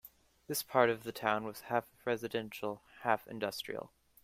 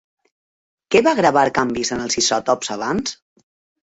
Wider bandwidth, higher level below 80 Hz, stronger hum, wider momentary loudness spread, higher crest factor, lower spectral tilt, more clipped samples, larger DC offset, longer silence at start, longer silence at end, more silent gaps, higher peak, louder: first, 16 kHz vs 8.2 kHz; second, -74 dBFS vs -54 dBFS; neither; first, 12 LU vs 7 LU; first, 24 dB vs 18 dB; about the same, -4 dB/octave vs -3 dB/octave; neither; neither; second, 0.05 s vs 0.9 s; second, 0.4 s vs 0.75 s; neither; second, -12 dBFS vs -2 dBFS; second, -36 LUFS vs -18 LUFS